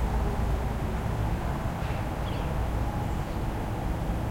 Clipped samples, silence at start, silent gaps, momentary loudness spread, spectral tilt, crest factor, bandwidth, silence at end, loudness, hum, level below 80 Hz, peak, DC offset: under 0.1%; 0 s; none; 3 LU; -7 dB/octave; 14 dB; 16.5 kHz; 0 s; -31 LUFS; none; -32 dBFS; -16 dBFS; under 0.1%